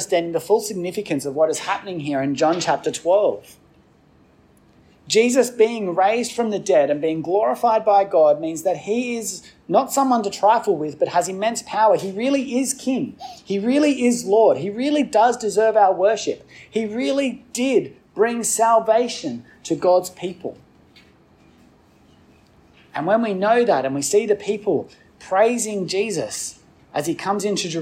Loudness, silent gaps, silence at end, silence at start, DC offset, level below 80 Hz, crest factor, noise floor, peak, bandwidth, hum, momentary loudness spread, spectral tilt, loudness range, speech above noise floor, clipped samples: -20 LUFS; none; 0 s; 0 s; under 0.1%; -64 dBFS; 16 dB; -54 dBFS; -4 dBFS; 16 kHz; none; 11 LU; -4 dB/octave; 5 LU; 35 dB; under 0.1%